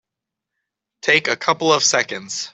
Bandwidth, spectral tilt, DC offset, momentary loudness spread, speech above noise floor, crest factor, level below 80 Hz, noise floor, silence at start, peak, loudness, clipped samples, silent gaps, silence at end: 8.4 kHz; -1.5 dB/octave; under 0.1%; 10 LU; 65 dB; 20 dB; -68 dBFS; -84 dBFS; 1.05 s; 0 dBFS; -17 LUFS; under 0.1%; none; 0.05 s